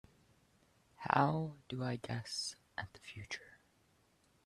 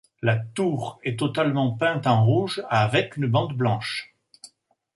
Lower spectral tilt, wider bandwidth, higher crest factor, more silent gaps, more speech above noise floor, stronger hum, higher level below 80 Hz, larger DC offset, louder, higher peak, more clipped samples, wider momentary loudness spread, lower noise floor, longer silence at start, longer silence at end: second, -5 dB/octave vs -6.5 dB/octave; first, 13 kHz vs 11.5 kHz; first, 28 dB vs 18 dB; neither; about the same, 34 dB vs 35 dB; neither; second, -72 dBFS vs -60 dBFS; neither; second, -39 LUFS vs -24 LUFS; second, -12 dBFS vs -6 dBFS; neither; first, 16 LU vs 7 LU; first, -73 dBFS vs -58 dBFS; first, 1 s vs 0.2 s; first, 0.95 s vs 0.5 s